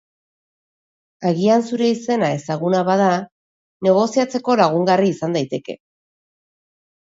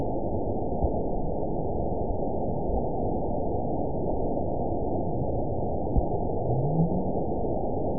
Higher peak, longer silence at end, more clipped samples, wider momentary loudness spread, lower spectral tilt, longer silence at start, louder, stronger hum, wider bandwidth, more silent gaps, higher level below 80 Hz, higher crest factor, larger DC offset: first, -2 dBFS vs -10 dBFS; first, 1.3 s vs 0 s; neither; first, 9 LU vs 3 LU; second, -6 dB/octave vs -18.5 dB/octave; first, 1.2 s vs 0 s; first, -18 LUFS vs -29 LUFS; neither; first, 7.8 kHz vs 1 kHz; first, 3.32-3.80 s vs none; second, -66 dBFS vs -36 dBFS; about the same, 18 dB vs 18 dB; second, under 0.1% vs 3%